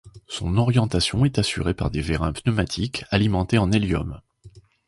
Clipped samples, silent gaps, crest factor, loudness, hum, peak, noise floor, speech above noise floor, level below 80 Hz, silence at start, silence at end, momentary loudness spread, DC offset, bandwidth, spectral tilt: under 0.1%; none; 18 dB; -22 LUFS; none; -4 dBFS; -49 dBFS; 27 dB; -36 dBFS; 0.05 s; 0.4 s; 7 LU; under 0.1%; 11.5 kHz; -6 dB/octave